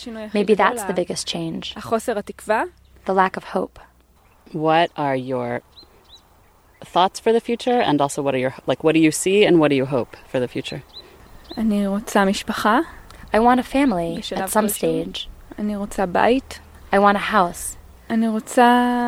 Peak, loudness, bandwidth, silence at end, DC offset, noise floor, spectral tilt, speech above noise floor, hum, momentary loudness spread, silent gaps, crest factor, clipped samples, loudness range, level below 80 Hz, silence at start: 0 dBFS; -20 LUFS; 16.5 kHz; 0 s; under 0.1%; -54 dBFS; -4.5 dB/octave; 35 dB; none; 14 LU; none; 20 dB; under 0.1%; 5 LU; -48 dBFS; 0 s